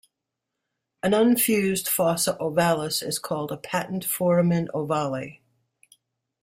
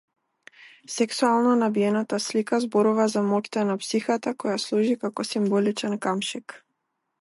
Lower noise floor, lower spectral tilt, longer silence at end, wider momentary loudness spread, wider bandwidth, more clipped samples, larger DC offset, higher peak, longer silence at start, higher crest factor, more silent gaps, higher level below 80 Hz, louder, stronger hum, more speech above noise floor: first, -83 dBFS vs -78 dBFS; about the same, -4.5 dB/octave vs -5 dB/octave; first, 1.1 s vs 0.65 s; first, 10 LU vs 7 LU; first, 16 kHz vs 11.5 kHz; neither; neither; about the same, -8 dBFS vs -10 dBFS; first, 1.05 s vs 0.9 s; about the same, 18 dB vs 16 dB; neither; first, -64 dBFS vs -78 dBFS; about the same, -24 LUFS vs -24 LUFS; neither; first, 60 dB vs 54 dB